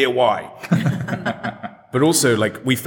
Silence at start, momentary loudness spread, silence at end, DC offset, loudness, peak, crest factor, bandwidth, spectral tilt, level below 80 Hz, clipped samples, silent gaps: 0 s; 12 LU; 0 s; under 0.1%; -19 LUFS; -2 dBFS; 16 dB; over 20 kHz; -4.5 dB/octave; -58 dBFS; under 0.1%; none